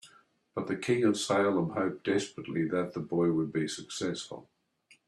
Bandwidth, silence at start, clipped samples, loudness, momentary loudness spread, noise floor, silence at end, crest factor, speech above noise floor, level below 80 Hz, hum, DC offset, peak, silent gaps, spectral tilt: 12.5 kHz; 0.05 s; under 0.1%; -31 LUFS; 11 LU; -65 dBFS; 0.65 s; 18 dB; 35 dB; -70 dBFS; none; under 0.1%; -14 dBFS; none; -5 dB/octave